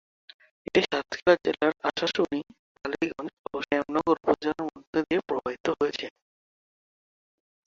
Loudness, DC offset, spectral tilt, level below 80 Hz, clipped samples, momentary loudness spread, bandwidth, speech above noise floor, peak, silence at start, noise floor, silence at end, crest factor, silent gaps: -28 LUFS; under 0.1%; -5 dB/octave; -62 dBFS; under 0.1%; 12 LU; 7.6 kHz; over 63 dB; -6 dBFS; 0.75 s; under -90 dBFS; 1.65 s; 22 dB; 2.59-2.75 s, 3.33-3.44 s, 4.87-4.93 s, 5.60-5.64 s